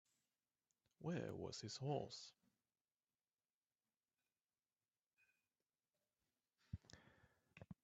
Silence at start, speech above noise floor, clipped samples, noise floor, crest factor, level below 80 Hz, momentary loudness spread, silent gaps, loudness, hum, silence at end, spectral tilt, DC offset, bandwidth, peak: 1 s; over 41 dB; under 0.1%; under -90 dBFS; 24 dB; -78 dBFS; 19 LU; 2.81-2.85 s, 3.54-3.61 s, 4.41-4.45 s, 5.06-5.11 s; -51 LUFS; none; 0.1 s; -5.5 dB/octave; under 0.1%; 8 kHz; -32 dBFS